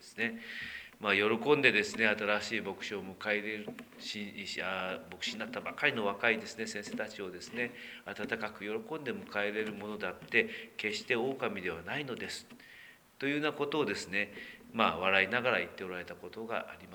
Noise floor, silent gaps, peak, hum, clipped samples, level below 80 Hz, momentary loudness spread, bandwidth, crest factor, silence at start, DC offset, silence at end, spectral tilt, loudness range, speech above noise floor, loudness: -55 dBFS; none; -10 dBFS; none; under 0.1%; -72 dBFS; 13 LU; over 20 kHz; 26 dB; 0 s; under 0.1%; 0 s; -4 dB/octave; 7 LU; 20 dB; -34 LUFS